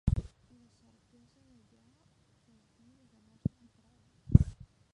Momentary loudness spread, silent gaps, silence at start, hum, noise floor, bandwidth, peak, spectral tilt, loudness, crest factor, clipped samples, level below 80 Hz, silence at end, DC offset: 13 LU; none; 0.05 s; none; -68 dBFS; 8.6 kHz; -4 dBFS; -10 dB/octave; -31 LUFS; 32 dB; under 0.1%; -40 dBFS; 0.45 s; under 0.1%